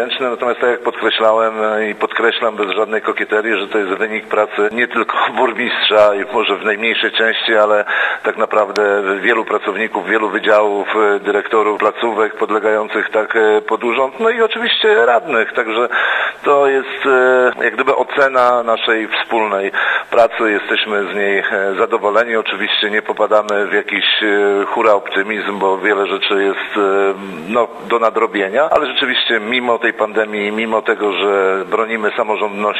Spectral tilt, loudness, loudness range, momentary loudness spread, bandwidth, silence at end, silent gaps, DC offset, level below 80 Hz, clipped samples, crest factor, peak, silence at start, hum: -4 dB/octave; -14 LUFS; 2 LU; 5 LU; 9 kHz; 0 s; none; under 0.1%; -64 dBFS; under 0.1%; 14 dB; 0 dBFS; 0 s; none